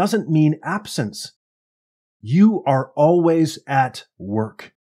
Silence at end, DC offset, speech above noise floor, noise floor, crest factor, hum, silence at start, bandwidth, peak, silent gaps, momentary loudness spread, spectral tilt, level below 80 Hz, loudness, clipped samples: 0.25 s; under 0.1%; over 72 dB; under -90 dBFS; 16 dB; none; 0 s; 14.5 kHz; -4 dBFS; 1.36-2.20 s; 15 LU; -7 dB/octave; -68 dBFS; -19 LUFS; under 0.1%